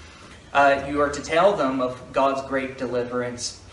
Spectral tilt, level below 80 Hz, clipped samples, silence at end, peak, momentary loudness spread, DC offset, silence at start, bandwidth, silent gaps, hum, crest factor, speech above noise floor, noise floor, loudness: -4 dB/octave; -50 dBFS; under 0.1%; 0 s; -6 dBFS; 9 LU; under 0.1%; 0 s; 11.5 kHz; none; none; 18 dB; 22 dB; -45 dBFS; -23 LUFS